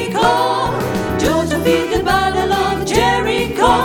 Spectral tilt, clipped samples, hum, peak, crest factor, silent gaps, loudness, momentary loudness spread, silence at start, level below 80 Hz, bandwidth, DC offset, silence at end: -4.5 dB/octave; under 0.1%; none; 0 dBFS; 16 dB; none; -15 LUFS; 4 LU; 0 s; -32 dBFS; 20 kHz; under 0.1%; 0 s